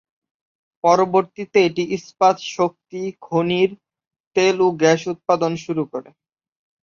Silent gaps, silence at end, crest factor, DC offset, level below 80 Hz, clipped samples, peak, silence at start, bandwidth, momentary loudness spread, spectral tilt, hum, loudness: 4.07-4.11 s, 4.20-4.31 s; 0.85 s; 18 dB; under 0.1%; -64 dBFS; under 0.1%; -2 dBFS; 0.85 s; 7.4 kHz; 9 LU; -5 dB/octave; none; -19 LUFS